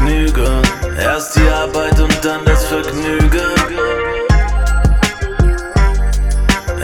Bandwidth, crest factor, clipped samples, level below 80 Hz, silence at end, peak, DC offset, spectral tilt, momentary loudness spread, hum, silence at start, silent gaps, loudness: 15.5 kHz; 12 dB; under 0.1%; -14 dBFS; 0 s; 0 dBFS; under 0.1%; -5 dB/octave; 4 LU; none; 0 s; none; -15 LUFS